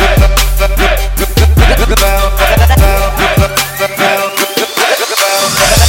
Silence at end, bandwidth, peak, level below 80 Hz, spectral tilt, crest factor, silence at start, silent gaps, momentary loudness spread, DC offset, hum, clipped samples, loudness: 0 s; 17.5 kHz; 0 dBFS; -12 dBFS; -3.5 dB/octave; 8 dB; 0 s; none; 4 LU; under 0.1%; none; 0.2%; -10 LUFS